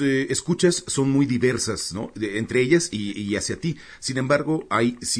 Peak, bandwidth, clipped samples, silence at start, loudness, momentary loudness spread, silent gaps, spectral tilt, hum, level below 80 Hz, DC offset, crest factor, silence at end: -6 dBFS; 11 kHz; under 0.1%; 0 s; -23 LUFS; 9 LU; none; -4.5 dB/octave; none; -54 dBFS; under 0.1%; 18 dB; 0 s